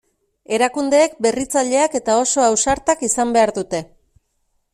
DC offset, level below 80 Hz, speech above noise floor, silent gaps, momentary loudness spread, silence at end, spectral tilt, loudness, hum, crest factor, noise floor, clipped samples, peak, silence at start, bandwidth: under 0.1%; -48 dBFS; 50 dB; none; 7 LU; 0.9 s; -2.5 dB/octave; -17 LUFS; none; 16 dB; -67 dBFS; under 0.1%; -2 dBFS; 0.5 s; 14.5 kHz